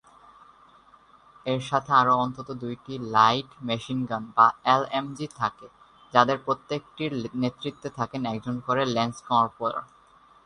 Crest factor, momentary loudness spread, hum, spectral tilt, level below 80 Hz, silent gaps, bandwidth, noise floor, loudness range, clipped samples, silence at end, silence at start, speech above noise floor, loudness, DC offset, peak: 24 dB; 14 LU; none; -5.5 dB/octave; -62 dBFS; none; 10.5 kHz; -56 dBFS; 4 LU; under 0.1%; 0.6 s; 1.45 s; 30 dB; -26 LUFS; under 0.1%; -2 dBFS